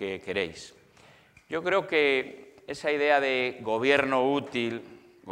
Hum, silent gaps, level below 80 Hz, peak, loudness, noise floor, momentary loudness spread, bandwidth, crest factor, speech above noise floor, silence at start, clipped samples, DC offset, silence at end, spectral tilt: none; none; -68 dBFS; -8 dBFS; -26 LUFS; -57 dBFS; 17 LU; 11 kHz; 22 dB; 30 dB; 0 s; under 0.1%; under 0.1%; 0 s; -4.5 dB/octave